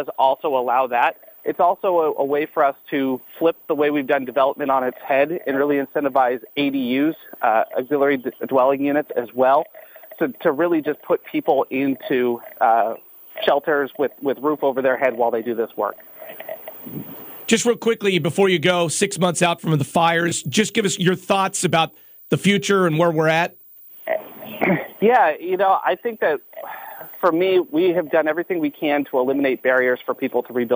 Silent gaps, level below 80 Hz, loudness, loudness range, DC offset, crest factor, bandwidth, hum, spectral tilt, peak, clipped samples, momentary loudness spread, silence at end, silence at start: none; -68 dBFS; -20 LUFS; 3 LU; under 0.1%; 16 dB; 16 kHz; none; -4.5 dB/octave; -4 dBFS; under 0.1%; 9 LU; 0 s; 0 s